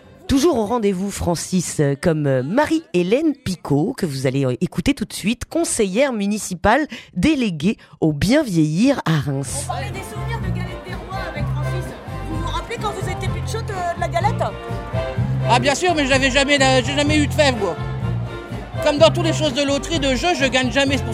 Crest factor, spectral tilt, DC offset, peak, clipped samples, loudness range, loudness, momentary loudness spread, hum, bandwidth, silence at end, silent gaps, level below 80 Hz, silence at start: 18 dB; -5 dB/octave; under 0.1%; 0 dBFS; under 0.1%; 8 LU; -19 LUFS; 11 LU; none; 15.5 kHz; 0 s; none; -36 dBFS; 0.25 s